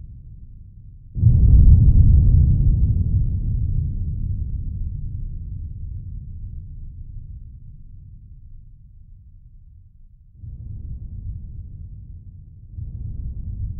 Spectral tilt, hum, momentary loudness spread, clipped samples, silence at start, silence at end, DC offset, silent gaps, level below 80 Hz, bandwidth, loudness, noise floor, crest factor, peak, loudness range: -19.5 dB/octave; none; 26 LU; under 0.1%; 0 s; 0 s; under 0.1%; none; -22 dBFS; 0.8 kHz; -19 LUFS; -46 dBFS; 18 dB; -2 dBFS; 24 LU